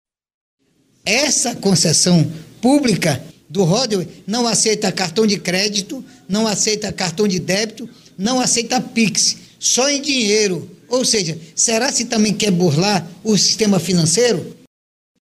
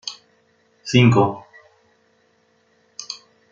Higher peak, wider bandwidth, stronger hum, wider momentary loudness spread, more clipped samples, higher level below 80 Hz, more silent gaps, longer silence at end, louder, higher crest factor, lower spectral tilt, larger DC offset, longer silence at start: about the same, -2 dBFS vs -2 dBFS; first, 15 kHz vs 7.6 kHz; neither; second, 9 LU vs 24 LU; neither; first, -54 dBFS vs -60 dBFS; neither; first, 0.7 s vs 0.35 s; about the same, -16 LUFS vs -17 LUFS; about the same, 16 dB vs 20 dB; second, -3.5 dB/octave vs -6 dB/octave; neither; first, 1.05 s vs 0.05 s